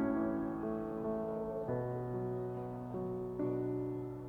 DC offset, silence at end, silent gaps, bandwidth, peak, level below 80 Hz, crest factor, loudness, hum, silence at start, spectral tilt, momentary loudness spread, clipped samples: under 0.1%; 0 s; none; 5 kHz; -24 dBFS; -60 dBFS; 14 dB; -39 LUFS; none; 0 s; -10.5 dB/octave; 4 LU; under 0.1%